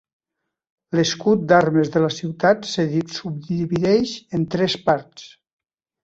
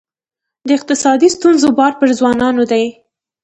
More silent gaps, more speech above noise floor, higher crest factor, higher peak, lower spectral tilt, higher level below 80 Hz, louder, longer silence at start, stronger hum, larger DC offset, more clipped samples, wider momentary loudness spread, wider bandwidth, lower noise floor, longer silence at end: neither; second, 61 dB vs 70 dB; first, 18 dB vs 12 dB; about the same, -2 dBFS vs 0 dBFS; first, -5.5 dB/octave vs -3.5 dB/octave; about the same, -56 dBFS vs -52 dBFS; second, -20 LUFS vs -12 LUFS; first, 0.9 s vs 0.65 s; neither; neither; neither; first, 10 LU vs 6 LU; second, 8 kHz vs 9 kHz; about the same, -81 dBFS vs -82 dBFS; first, 0.75 s vs 0.55 s